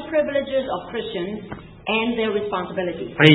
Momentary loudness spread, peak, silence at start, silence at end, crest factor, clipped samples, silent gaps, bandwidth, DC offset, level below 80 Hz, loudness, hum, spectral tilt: 9 LU; 0 dBFS; 0 s; 0 s; 22 dB; under 0.1%; none; 8 kHz; under 0.1%; -52 dBFS; -24 LUFS; none; -7.5 dB/octave